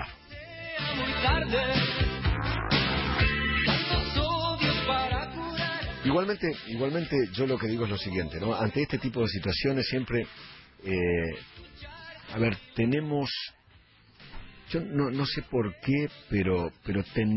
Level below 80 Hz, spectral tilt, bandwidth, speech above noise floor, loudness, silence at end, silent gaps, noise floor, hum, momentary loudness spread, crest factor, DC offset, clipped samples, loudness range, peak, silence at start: -40 dBFS; -9.5 dB/octave; 5.8 kHz; 30 dB; -28 LUFS; 0 s; none; -59 dBFS; none; 15 LU; 18 dB; under 0.1%; under 0.1%; 5 LU; -12 dBFS; 0 s